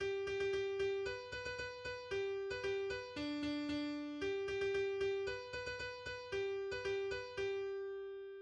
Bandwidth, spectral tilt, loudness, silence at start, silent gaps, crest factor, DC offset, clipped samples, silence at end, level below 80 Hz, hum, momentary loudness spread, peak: 9.2 kHz; -4.5 dB/octave; -41 LUFS; 0 s; none; 12 dB; under 0.1%; under 0.1%; 0 s; -64 dBFS; none; 6 LU; -28 dBFS